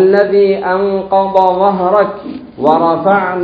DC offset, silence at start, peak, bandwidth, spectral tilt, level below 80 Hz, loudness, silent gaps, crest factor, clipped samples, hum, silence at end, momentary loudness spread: under 0.1%; 0 s; 0 dBFS; 5.2 kHz; -8.5 dB/octave; -50 dBFS; -12 LUFS; none; 12 dB; 0.1%; none; 0 s; 6 LU